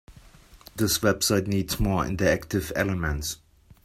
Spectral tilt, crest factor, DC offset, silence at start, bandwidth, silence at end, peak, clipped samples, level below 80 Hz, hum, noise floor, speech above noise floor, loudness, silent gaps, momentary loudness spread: -4.5 dB/octave; 20 dB; under 0.1%; 0.1 s; 16 kHz; 0.5 s; -8 dBFS; under 0.1%; -40 dBFS; none; -51 dBFS; 26 dB; -25 LUFS; none; 9 LU